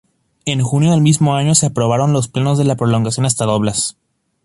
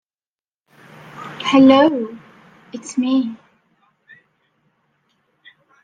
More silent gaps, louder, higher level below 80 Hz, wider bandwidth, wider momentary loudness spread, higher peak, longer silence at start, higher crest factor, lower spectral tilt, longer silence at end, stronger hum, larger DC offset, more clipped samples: neither; about the same, -15 LUFS vs -15 LUFS; first, -48 dBFS vs -64 dBFS; first, 11.5 kHz vs 9.2 kHz; second, 7 LU vs 25 LU; about the same, 0 dBFS vs -2 dBFS; second, 0.45 s vs 1.15 s; about the same, 14 dB vs 18 dB; about the same, -5.5 dB/octave vs -5 dB/octave; second, 0.55 s vs 2.5 s; neither; neither; neither